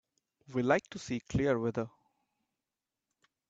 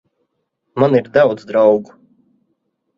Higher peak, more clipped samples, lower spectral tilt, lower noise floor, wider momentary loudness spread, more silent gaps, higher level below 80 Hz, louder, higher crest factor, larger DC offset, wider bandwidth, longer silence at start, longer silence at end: second, -12 dBFS vs 0 dBFS; neither; second, -6.5 dB/octave vs -8.5 dB/octave; first, under -90 dBFS vs -71 dBFS; first, 9 LU vs 6 LU; neither; about the same, -58 dBFS vs -60 dBFS; second, -33 LUFS vs -14 LUFS; first, 24 dB vs 18 dB; neither; first, 8 kHz vs 7.2 kHz; second, 0.5 s vs 0.75 s; first, 1.6 s vs 1.15 s